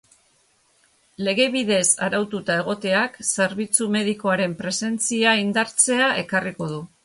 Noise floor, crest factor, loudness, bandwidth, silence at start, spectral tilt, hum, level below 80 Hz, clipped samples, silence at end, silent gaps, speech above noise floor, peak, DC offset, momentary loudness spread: -62 dBFS; 20 dB; -21 LUFS; 11.5 kHz; 1.2 s; -2.5 dB/octave; none; -64 dBFS; under 0.1%; 0.2 s; none; 40 dB; -2 dBFS; under 0.1%; 7 LU